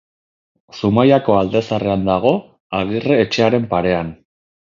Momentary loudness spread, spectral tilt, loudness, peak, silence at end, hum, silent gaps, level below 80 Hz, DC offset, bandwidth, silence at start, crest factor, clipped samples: 10 LU; -7 dB/octave; -16 LUFS; 0 dBFS; 0.55 s; none; 2.60-2.70 s; -46 dBFS; under 0.1%; 7.4 kHz; 0.75 s; 16 dB; under 0.1%